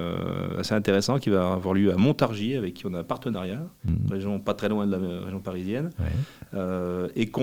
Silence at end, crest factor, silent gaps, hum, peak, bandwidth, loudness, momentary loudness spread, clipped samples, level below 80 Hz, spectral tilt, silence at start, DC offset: 0 s; 20 dB; none; none; -6 dBFS; 16.5 kHz; -27 LUFS; 10 LU; under 0.1%; -48 dBFS; -7 dB/octave; 0 s; 0.2%